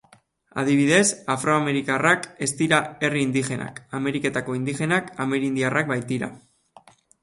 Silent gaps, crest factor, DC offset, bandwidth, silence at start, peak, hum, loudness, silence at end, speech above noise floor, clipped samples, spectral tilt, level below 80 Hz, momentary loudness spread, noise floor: none; 20 dB; under 0.1%; 11.5 kHz; 0.55 s; -4 dBFS; none; -23 LUFS; 0.85 s; 34 dB; under 0.1%; -4.5 dB/octave; -62 dBFS; 10 LU; -57 dBFS